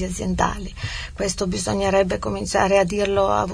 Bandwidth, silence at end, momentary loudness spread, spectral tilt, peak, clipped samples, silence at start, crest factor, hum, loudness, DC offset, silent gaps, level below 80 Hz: 11 kHz; 0 s; 11 LU; -4.5 dB/octave; -4 dBFS; under 0.1%; 0 s; 18 dB; none; -22 LUFS; 0.2%; none; -36 dBFS